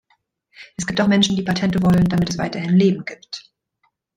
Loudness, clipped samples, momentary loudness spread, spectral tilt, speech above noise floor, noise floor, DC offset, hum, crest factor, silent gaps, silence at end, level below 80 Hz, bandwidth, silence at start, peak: -18 LUFS; under 0.1%; 17 LU; -5.5 dB/octave; 50 dB; -68 dBFS; under 0.1%; none; 16 dB; none; 0.75 s; -46 dBFS; 9.8 kHz; 0.6 s; -4 dBFS